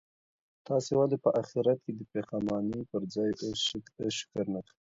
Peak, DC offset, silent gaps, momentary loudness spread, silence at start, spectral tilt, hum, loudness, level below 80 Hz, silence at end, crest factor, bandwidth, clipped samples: -12 dBFS; under 0.1%; none; 9 LU; 0.7 s; -5.5 dB/octave; none; -32 LUFS; -66 dBFS; 0.35 s; 20 dB; 8 kHz; under 0.1%